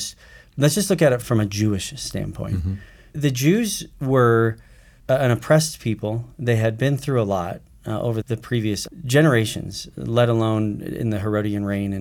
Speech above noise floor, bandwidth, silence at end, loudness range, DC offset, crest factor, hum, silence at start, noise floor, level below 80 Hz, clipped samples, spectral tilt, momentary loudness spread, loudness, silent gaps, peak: 22 dB; 18 kHz; 0 s; 2 LU; under 0.1%; 16 dB; none; 0 s; -42 dBFS; -46 dBFS; under 0.1%; -5.5 dB/octave; 12 LU; -21 LUFS; none; -4 dBFS